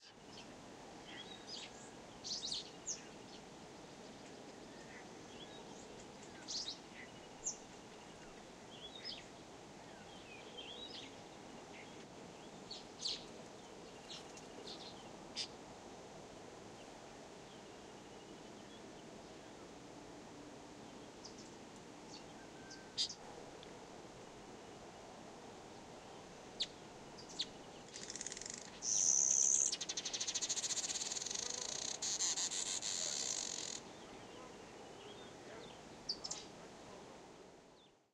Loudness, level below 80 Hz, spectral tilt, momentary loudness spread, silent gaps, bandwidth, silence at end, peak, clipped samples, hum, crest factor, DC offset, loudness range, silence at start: -41 LUFS; -74 dBFS; -0.5 dB/octave; 17 LU; none; 14.5 kHz; 0.2 s; -18 dBFS; under 0.1%; none; 28 dB; under 0.1%; 19 LU; 0 s